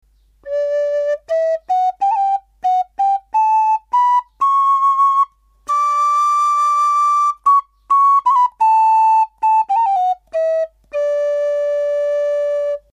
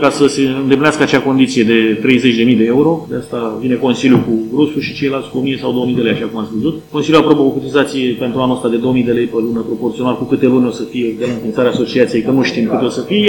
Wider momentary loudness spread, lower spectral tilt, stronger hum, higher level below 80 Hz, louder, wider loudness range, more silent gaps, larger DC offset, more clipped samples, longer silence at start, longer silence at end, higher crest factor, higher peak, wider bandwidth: about the same, 7 LU vs 7 LU; second, -0.5 dB/octave vs -6 dB/octave; second, none vs 50 Hz at -40 dBFS; second, -60 dBFS vs -48 dBFS; about the same, -16 LUFS vs -14 LUFS; about the same, 4 LU vs 3 LU; neither; neither; second, under 0.1% vs 0.2%; first, 0.45 s vs 0 s; first, 0.15 s vs 0 s; about the same, 10 dB vs 14 dB; second, -6 dBFS vs 0 dBFS; second, 11 kHz vs 17.5 kHz